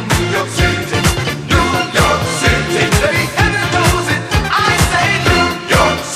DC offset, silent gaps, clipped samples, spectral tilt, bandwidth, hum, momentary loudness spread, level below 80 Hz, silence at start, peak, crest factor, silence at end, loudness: under 0.1%; none; under 0.1%; -4 dB/octave; 16 kHz; none; 3 LU; -24 dBFS; 0 s; 0 dBFS; 14 dB; 0 s; -13 LUFS